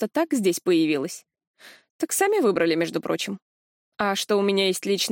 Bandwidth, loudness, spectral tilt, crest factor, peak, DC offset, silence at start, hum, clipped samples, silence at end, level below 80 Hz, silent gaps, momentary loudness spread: 17 kHz; -23 LUFS; -3.5 dB/octave; 16 dB; -8 dBFS; under 0.1%; 0 s; none; under 0.1%; 0 s; -72 dBFS; 1.47-1.54 s, 1.90-1.99 s, 3.42-3.92 s; 11 LU